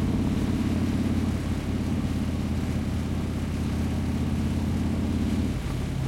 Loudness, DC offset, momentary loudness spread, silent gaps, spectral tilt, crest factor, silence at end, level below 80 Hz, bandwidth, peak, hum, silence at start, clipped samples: -28 LUFS; under 0.1%; 3 LU; none; -7 dB/octave; 14 dB; 0 s; -36 dBFS; 15.5 kHz; -14 dBFS; none; 0 s; under 0.1%